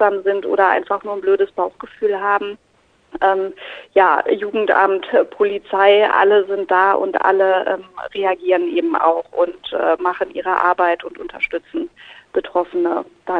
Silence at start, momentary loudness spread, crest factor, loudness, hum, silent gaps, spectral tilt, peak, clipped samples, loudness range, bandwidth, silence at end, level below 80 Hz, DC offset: 0 s; 11 LU; 16 dB; -17 LUFS; none; none; -6 dB/octave; -2 dBFS; under 0.1%; 5 LU; 4.9 kHz; 0 s; -60 dBFS; under 0.1%